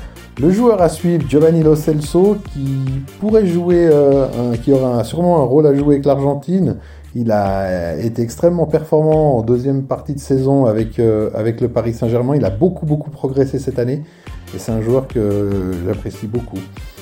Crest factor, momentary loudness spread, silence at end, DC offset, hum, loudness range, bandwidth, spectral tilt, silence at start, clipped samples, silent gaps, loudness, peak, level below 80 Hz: 14 dB; 11 LU; 0 s; under 0.1%; none; 5 LU; 16.5 kHz; -8.5 dB/octave; 0 s; under 0.1%; none; -15 LUFS; 0 dBFS; -36 dBFS